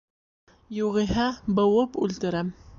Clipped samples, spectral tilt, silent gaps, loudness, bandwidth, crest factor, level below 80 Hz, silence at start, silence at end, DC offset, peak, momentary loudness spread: under 0.1%; -6.5 dB/octave; none; -25 LUFS; 7.4 kHz; 14 dB; -48 dBFS; 0.7 s; 0.05 s; under 0.1%; -12 dBFS; 8 LU